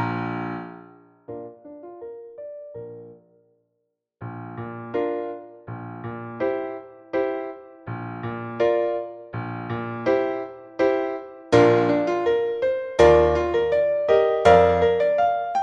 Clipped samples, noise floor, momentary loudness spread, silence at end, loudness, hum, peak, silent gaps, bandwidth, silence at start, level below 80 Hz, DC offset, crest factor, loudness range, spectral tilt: under 0.1%; -76 dBFS; 22 LU; 0 s; -21 LUFS; none; -2 dBFS; none; 9 kHz; 0 s; -46 dBFS; under 0.1%; 22 dB; 20 LU; -7 dB/octave